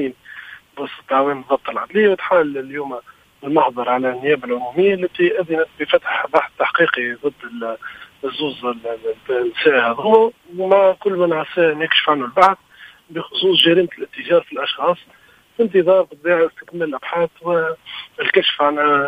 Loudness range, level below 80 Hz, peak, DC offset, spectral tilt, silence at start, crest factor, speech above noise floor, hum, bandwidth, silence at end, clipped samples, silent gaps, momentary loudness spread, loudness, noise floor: 4 LU; -62 dBFS; 0 dBFS; under 0.1%; -5.5 dB/octave; 0 s; 18 dB; 21 dB; none; 15 kHz; 0 s; under 0.1%; none; 15 LU; -17 LUFS; -38 dBFS